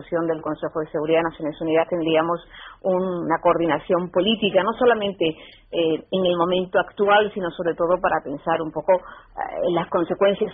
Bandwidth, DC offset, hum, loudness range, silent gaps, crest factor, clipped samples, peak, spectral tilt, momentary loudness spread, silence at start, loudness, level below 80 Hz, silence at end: 3.9 kHz; under 0.1%; none; 2 LU; none; 18 dB; under 0.1%; -4 dBFS; -2 dB/octave; 8 LU; 0 s; -22 LUFS; -54 dBFS; 0 s